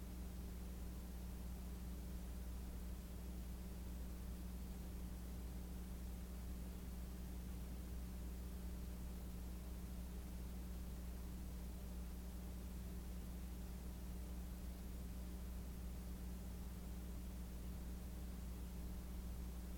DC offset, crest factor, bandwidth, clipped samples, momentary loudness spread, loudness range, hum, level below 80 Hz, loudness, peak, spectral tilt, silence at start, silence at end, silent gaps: under 0.1%; 10 dB; 17.5 kHz; under 0.1%; 1 LU; 0 LU; none; -50 dBFS; -52 LUFS; -38 dBFS; -6 dB/octave; 0 s; 0 s; none